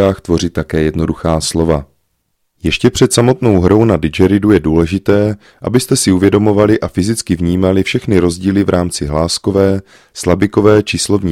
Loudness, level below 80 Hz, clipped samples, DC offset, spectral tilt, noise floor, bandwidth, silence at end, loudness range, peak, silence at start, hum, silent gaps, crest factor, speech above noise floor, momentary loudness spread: -13 LUFS; -32 dBFS; 0.1%; under 0.1%; -5.5 dB/octave; -65 dBFS; 16 kHz; 0 s; 2 LU; 0 dBFS; 0 s; none; none; 12 dB; 53 dB; 6 LU